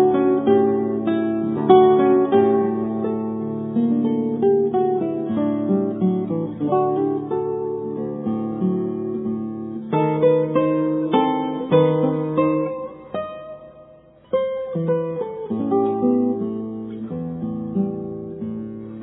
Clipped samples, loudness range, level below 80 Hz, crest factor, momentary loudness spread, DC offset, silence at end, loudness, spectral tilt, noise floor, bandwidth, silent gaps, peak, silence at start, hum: under 0.1%; 6 LU; -60 dBFS; 20 dB; 13 LU; under 0.1%; 0 s; -21 LUFS; -12 dB/octave; -48 dBFS; 3.9 kHz; none; 0 dBFS; 0 s; none